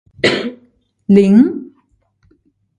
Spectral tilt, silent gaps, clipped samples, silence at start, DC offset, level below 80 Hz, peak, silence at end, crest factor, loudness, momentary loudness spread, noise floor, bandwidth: -6.5 dB/octave; none; under 0.1%; 0.25 s; under 0.1%; -54 dBFS; 0 dBFS; 1.15 s; 16 dB; -12 LUFS; 19 LU; -59 dBFS; 9.6 kHz